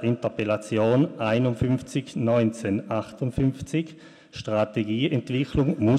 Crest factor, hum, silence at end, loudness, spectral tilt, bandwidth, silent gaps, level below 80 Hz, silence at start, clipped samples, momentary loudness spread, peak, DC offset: 16 dB; none; 0 s; -25 LUFS; -7.5 dB/octave; 11.5 kHz; none; -48 dBFS; 0 s; under 0.1%; 7 LU; -8 dBFS; under 0.1%